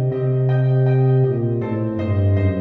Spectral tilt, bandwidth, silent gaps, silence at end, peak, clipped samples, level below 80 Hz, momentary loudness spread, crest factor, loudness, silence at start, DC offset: -11.5 dB/octave; 4 kHz; none; 0 s; -8 dBFS; under 0.1%; -48 dBFS; 6 LU; 10 dB; -18 LUFS; 0 s; under 0.1%